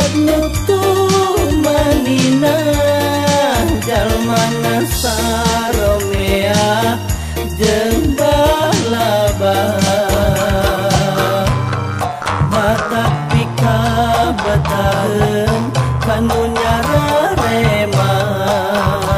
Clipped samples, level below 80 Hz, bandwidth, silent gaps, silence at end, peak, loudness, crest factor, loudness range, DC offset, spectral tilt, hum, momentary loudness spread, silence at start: under 0.1%; -26 dBFS; 15.5 kHz; none; 0 s; 0 dBFS; -14 LUFS; 12 dB; 2 LU; under 0.1%; -5 dB/octave; none; 3 LU; 0 s